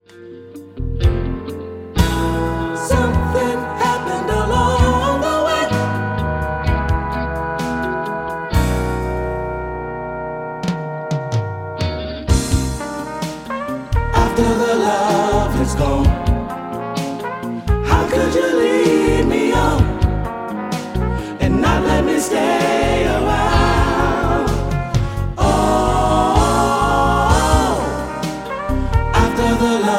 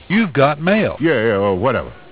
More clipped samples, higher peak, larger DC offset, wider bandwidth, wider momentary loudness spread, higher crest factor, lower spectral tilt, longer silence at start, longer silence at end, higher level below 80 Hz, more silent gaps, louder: neither; about the same, 0 dBFS vs 0 dBFS; second, under 0.1% vs 0.5%; first, 16.5 kHz vs 4 kHz; first, 10 LU vs 4 LU; about the same, 16 dB vs 16 dB; second, -6 dB/octave vs -10.5 dB/octave; about the same, 0.15 s vs 0.1 s; second, 0 s vs 0.15 s; first, -24 dBFS vs -42 dBFS; neither; about the same, -18 LUFS vs -16 LUFS